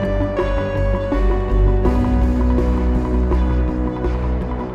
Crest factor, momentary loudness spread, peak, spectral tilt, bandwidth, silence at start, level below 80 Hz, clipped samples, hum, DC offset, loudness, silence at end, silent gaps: 12 dB; 4 LU; -4 dBFS; -9 dB/octave; 5.8 kHz; 0 s; -18 dBFS; under 0.1%; none; under 0.1%; -19 LUFS; 0 s; none